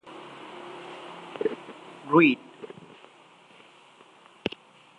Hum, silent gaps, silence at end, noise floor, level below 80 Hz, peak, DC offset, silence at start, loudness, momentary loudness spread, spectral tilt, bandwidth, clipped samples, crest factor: none; none; 2.3 s; -55 dBFS; -72 dBFS; -6 dBFS; under 0.1%; 0.05 s; -25 LUFS; 25 LU; -6.5 dB/octave; 9.8 kHz; under 0.1%; 24 dB